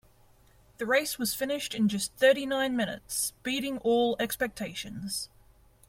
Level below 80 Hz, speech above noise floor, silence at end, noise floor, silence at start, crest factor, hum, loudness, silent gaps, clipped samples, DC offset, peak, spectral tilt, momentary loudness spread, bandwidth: -60 dBFS; 31 dB; 0.65 s; -60 dBFS; 0.8 s; 18 dB; none; -29 LUFS; none; under 0.1%; under 0.1%; -12 dBFS; -3 dB/octave; 11 LU; 16.5 kHz